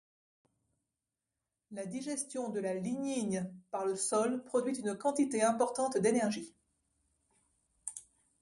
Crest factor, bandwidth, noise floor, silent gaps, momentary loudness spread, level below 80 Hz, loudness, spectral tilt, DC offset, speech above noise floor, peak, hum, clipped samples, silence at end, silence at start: 20 dB; 11.5 kHz; -90 dBFS; none; 14 LU; -78 dBFS; -34 LUFS; -4.5 dB/octave; under 0.1%; 56 dB; -16 dBFS; none; under 0.1%; 0.4 s; 1.7 s